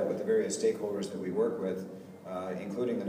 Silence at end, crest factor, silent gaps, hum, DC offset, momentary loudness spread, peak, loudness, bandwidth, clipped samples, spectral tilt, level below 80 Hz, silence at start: 0 s; 14 dB; none; none; under 0.1%; 11 LU; -18 dBFS; -33 LUFS; 15.5 kHz; under 0.1%; -5.5 dB/octave; -76 dBFS; 0 s